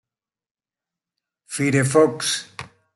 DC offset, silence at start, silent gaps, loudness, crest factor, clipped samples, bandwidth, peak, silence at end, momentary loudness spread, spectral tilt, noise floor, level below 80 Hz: under 0.1%; 1.5 s; none; -20 LUFS; 20 dB; under 0.1%; 12 kHz; -4 dBFS; 0.3 s; 19 LU; -4.5 dB/octave; under -90 dBFS; -64 dBFS